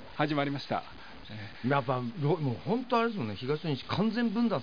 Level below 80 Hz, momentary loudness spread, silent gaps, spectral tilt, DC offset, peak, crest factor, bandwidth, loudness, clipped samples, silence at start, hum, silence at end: -64 dBFS; 13 LU; none; -8 dB/octave; 0.4%; -12 dBFS; 20 dB; 5.2 kHz; -31 LUFS; under 0.1%; 0 s; none; 0 s